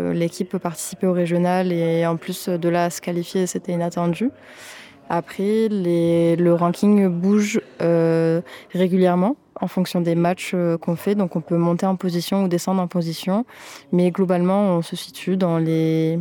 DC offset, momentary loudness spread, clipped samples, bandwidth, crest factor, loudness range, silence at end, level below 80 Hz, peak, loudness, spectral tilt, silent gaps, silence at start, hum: under 0.1%; 9 LU; under 0.1%; 18.5 kHz; 14 dB; 4 LU; 0 s; -66 dBFS; -6 dBFS; -21 LUFS; -6.5 dB/octave; none; 0 s; none